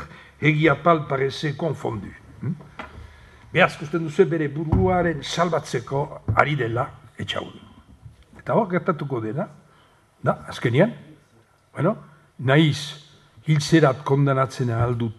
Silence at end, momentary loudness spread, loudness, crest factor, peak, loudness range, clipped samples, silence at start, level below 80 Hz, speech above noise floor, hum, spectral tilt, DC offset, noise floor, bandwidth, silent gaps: 0.05 s; 16 LU; -22 LUFS; 22 dB; 0 dBFS; 5 LU; under 0.1%; 0 s; -44 dBFS; 36 dB; none; -6.5 dB/octave; under 0.1%; -58 dBFS; 12 kHz; none